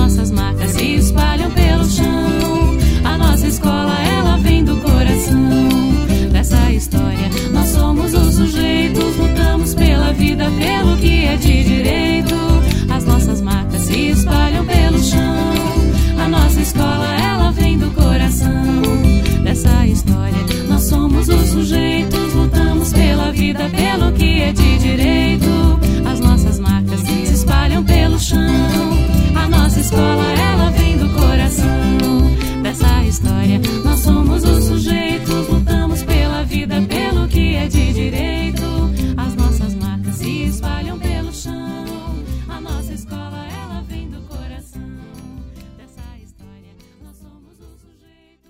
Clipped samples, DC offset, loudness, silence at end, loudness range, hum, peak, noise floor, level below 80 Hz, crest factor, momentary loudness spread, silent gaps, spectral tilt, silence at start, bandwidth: under 0.1%; under 0.1%; -15 LUFS; 1.4 s; 9 LU; none; 0 dBFS; -52 dBFS; -18 dBFS; 14 dB; 9 LU; none; -5.5 dB/octave; 0 s; 16.5 kHz